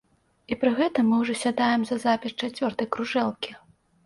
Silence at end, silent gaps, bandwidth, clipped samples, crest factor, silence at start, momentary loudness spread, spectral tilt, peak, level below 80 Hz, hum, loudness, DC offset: 0.5 s; none; 11.5 kHz; under 0.1%; 16 dB; 0.5 s; 8 LU; -4.5 dB/octave; -10 dBFS; -64 dBFS; none; -25 LUFS; under 0.1%